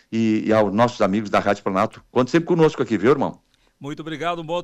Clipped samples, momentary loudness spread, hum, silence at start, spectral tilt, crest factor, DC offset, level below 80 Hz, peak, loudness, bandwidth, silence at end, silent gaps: under 0.1%; 9 LU; none; 0.1 s; -6.5 dB/octave; 14 dB; under 0.1%; -56 dBFS; -6 dBFS; -20 LUFS; 9.8 kHz; 0 s; none